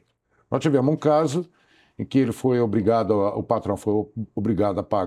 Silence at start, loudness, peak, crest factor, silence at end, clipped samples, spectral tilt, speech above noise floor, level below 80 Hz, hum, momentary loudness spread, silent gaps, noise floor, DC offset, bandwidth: 0.5 s; -23 LUFS; -6 dBFS; 18 dB; 0 s; under 0.1%; -7.5 dB/octave; 44 dB; -60 dBFS; none; 9 LU; none; -66 dBFS; under 0.1%; 13.5 kHz